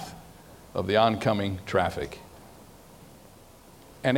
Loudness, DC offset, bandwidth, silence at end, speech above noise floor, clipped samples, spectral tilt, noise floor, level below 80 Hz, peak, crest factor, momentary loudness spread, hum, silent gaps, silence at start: -27 LUFS; under 0.1%; 17 kHz; 0 s; 26 dB; under 0.1%; -6 dB/octave; -52 dBFS; -54 dBFS; -8 dBFS; 22 dB; 26 LU; none; none; 0 s